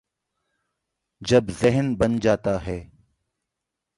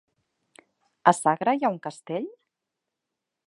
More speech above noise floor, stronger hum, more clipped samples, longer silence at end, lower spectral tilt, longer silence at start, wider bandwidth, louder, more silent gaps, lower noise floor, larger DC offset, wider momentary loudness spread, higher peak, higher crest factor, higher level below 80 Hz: about the same, 62 dB vs 61 dB; neither; neither; about the same, 1.1 s vs 1.2 s; first, -6.5 dB/octave vs -5 dB/octave; first, 1.2 s vs 1.05 s; about the same, 11.5 kHz vs 11.5 kHz; first, -22 LUFS vs -25 LUFS; neither; about the same, -84 dBFS vs -85 dBFS; neither; about the same, 13 LU vs 13 LU; about the same, -4 dBFS vs -2 dBFS; second, 20 dB vs 26 dB; first, -46 dBFS vs -80 dBFS